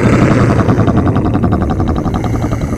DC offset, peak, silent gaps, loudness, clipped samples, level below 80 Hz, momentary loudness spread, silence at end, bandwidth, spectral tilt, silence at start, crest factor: under 0.1%; 0 dBFS; none; -12 LUFS; under 0.1%; -24 dBFS; 6 LU; 0 s; 12 kHz; -8 dB/octave; 0 s; 12 dB